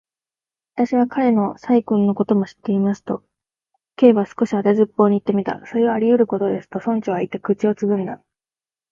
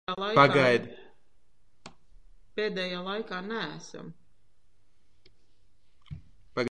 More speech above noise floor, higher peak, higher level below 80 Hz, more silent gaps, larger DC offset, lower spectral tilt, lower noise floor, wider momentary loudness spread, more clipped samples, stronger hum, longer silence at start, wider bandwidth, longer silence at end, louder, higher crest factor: first, over 72 dB vs 42 dB; first, 0 dBFS vs -6 dBFS; about the same, -64 dBFS vs -64 dBFS; neither; second, under 0.1% vs 0.3%; first, -8.5 dB/octave vs -5.5 dB/octave; first, under -90 dBFS vs -69 dBFS; second, 8 LU vs 27 LU; neither; neither; first, 0.75 s vs 0.05 s; second, 7.2 kHz vs 10 kHz; first, 0.75 s vs 0.05 s; first, -19 LUFS vs -27 LUFS; second, 18 dB vs 26 dB